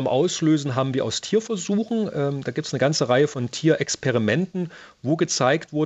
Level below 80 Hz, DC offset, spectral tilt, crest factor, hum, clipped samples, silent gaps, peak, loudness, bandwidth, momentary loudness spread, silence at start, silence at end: -66 dBFS; under 0.1%; -5 dB/octave; 18 dB; none; under 0.1%; none; -4 dBFS; -23 LUFS; 8.2 kHz; 7 LU; 0 s; 0 s